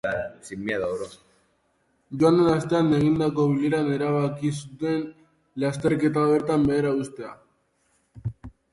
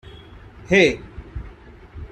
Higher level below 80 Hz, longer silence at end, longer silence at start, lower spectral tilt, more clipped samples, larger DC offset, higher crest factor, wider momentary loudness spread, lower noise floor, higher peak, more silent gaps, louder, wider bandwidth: second, -54 dBFS vs -40 dBFS; first, 0.25 s vs 0.05 s; about the same, 0.05 s vs 0.05 s; first, -7 dB/octave vs -5 dB/octave; neither; neither; second, 16 dB vs 22 dB; second, 16 LU vs 24 LU; first, -68 dBFS vs -43 dBFS; second, -8 dBFS vs -2 dBFS; neither; second, -24 LUFS vs -17 LUFS; first, 11.5 kHz vs 9.6 kHz